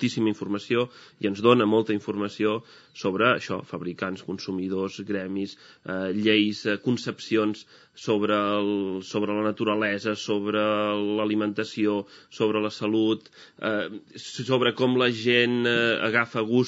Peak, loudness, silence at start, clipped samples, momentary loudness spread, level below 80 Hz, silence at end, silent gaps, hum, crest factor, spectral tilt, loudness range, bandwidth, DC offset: -4 dBFS; -25 LUFS; 0 s; under 0.1%; 11 LU; -76 dBFS; 0 s; none; none; 22 dB; -3.5 dB/octave; 4 LU; 8 kHz; under 0.1%